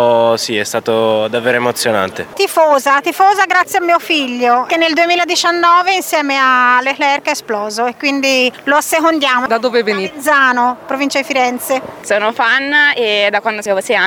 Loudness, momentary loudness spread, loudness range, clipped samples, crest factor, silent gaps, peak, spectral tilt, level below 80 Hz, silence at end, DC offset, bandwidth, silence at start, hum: -12 LUFS; 7 LU; 2 LU; under 0.1%; 12 dB; none; 0 dBFS; -2.5 dB/octave; -62 dBFS; 0 s; under 0.1%; over 20 kHz; 0 s; none